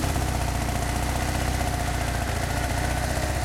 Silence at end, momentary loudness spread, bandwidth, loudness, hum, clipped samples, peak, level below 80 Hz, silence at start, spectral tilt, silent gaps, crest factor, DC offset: 0 s; 1 LU; 16.5 kHz; -26 LUFS; none; under 0.1%; -12 dBFS; -30 dBFS; 0 s; -4.5 dB/octave; none; 14 dB; under 0.1%